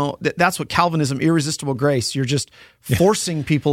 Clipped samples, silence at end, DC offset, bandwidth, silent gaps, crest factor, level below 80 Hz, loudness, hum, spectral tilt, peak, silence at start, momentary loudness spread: under 0.1%; 0 s; under 0.1%; 16.5 kHz; none; 18 dB; -50 dBFS; -19 LUFS; none; -5 dB/octave; 0 dBFS; 0 s; 6 LU